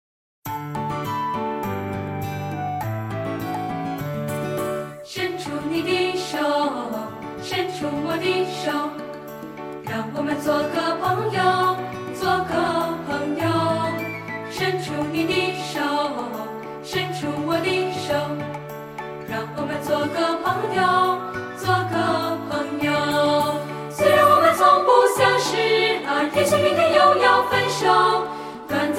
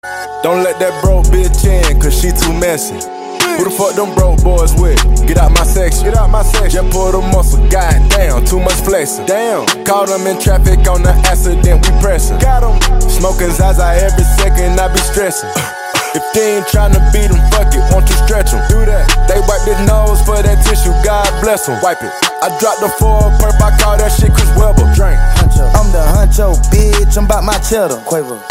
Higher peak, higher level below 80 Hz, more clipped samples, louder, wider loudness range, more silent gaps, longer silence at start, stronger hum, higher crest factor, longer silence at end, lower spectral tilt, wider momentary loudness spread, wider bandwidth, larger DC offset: second, -4 dBFS vs 0 dBFS; second, -56 dBFS vs -10 dBFS; second, under 0.1% vs 0.3%; second, -22 LUFS vs -11 LUFS; first, 10 LU vs 2 LU; neither; first, 0.45 s vs 0.05 s; neither; first, 18 dB vs 8 dB; about the same, 0 s vs 0 s; about the same, -4.5 dB/octave vs -4.5 dB/octave; first, 14 LU vs 4 LU; about the same, 16.5 kHz vs 16 kHz; neither